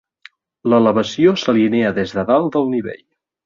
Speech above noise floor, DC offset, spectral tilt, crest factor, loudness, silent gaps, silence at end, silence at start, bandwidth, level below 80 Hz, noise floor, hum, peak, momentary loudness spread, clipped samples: 32 dB; under 0.1%; -6.5 dB/octave; 14 dB; -16 LUFS; none; 0.5 s; 0.65 s; 7.4 kHz; -54 dBFS; -47 dBFS; none; -2 dBFS; 8 LU; under 0.1%